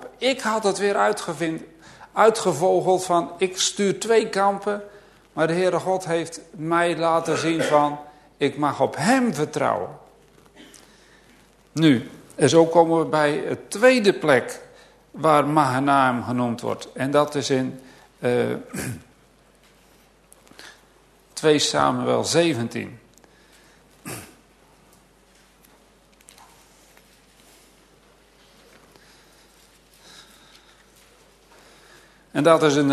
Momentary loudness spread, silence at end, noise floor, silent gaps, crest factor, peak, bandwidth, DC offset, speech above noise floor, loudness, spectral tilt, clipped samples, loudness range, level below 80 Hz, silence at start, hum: 15 LU; 0 s; -56 dBFS; none; 22 dB; -2 dBFS; 13.5 kHz; under 0.1%; 35 dB; -21 LUFS; -4.5 dB/octave; under 0.1%; 8 LU; -62 dBFS; 0 s; none